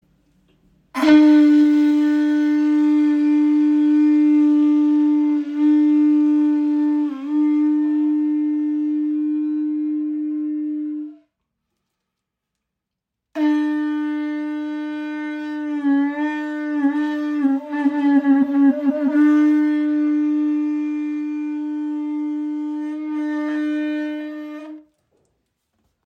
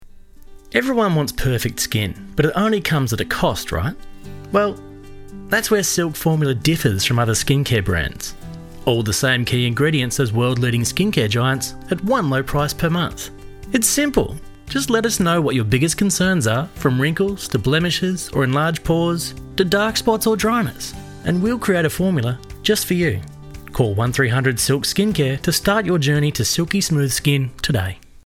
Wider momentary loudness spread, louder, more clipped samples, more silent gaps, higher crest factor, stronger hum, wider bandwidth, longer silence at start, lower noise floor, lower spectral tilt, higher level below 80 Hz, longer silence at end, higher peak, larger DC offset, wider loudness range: first, 11 LU vs 8 LU; about the same, -19 LUFS vs -19 LUFS; neither; neither; about the same, 16 dB vs 16 dB; neither; second, 6 kHz vs 17.5 kHz; first, 0.95 s vs 0 s; first, -82 dBFS vs -40 dBFS; about the same, -5.5 dB/octave vs -4.5 dB/octave; second, -72 dBFS vs -38 dBFS; first, 1.25 s vs 0.25 s; about the same, -4 dBFS vs -2 dBFS; neither; first, 10 LU vs 3 LU